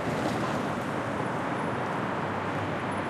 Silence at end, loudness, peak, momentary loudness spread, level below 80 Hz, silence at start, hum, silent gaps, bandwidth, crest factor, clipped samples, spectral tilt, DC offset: 0 s; -30 LUFS; -16 dBFS; 2 LU; -60 dBFS; 0 s; none; none; 14.5 kHz; 14 dB; under 0.1%; -6 dB/octave; under 0.1%